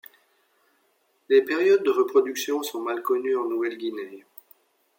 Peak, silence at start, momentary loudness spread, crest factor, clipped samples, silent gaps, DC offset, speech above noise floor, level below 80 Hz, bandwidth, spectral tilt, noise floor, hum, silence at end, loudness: -8 dBFS; 1.3 s; 12 LU; 18 dB; under 0.1%; none; under 0.1%; 45 dB; -86 dBFS; 17 kHz; -3 dB/octave; -68 dBFS; none; 0.8 s; -24 LUFS